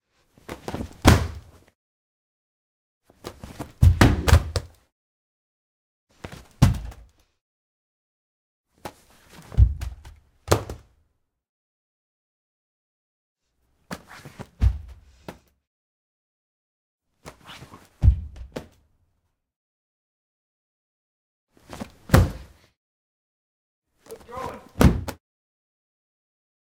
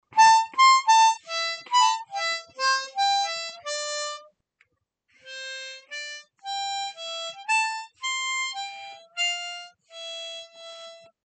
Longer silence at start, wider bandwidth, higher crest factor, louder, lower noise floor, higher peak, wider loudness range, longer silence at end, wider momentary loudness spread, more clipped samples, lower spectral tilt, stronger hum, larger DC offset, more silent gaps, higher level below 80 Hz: first, 0.5 s vs 0.1 s; first, 17.5 kHz vs 9.2 kHz; first, 28 dB vs 20 dB; about the same, -22 LUFS vs -24 LUFS; about the same, -73 dBFS vs -73 dBFS; first, 0 dBFS vs -6 dBFS; second, 10 LU vs 13 LU; first, 1.55 s vs 0.3 s; first, 25 LU vs 22 LU; neither; first, -6 dB/octave vs 3 dB/octave; neither; neither; first, 1.75-3.01 s, 4.92-6.07 s, 7.41-8.64 s, 11.49-13.36 s, 15.67-16.99 s, 19.56-21.47 s, 22.77-23.82 s vs none; first, -32 dBFS vs -86 dBFS